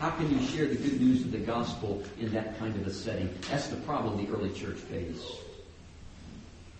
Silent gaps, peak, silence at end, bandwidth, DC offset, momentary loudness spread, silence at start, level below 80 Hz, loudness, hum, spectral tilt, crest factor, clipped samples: none; -16 dBFS; 0 s; 8.4 kHz; under 0.1%; 21 LU; 0 s; -52 dBFS; -32 LUFS; none; -6 dB/octave; 18 dB; under 0.1%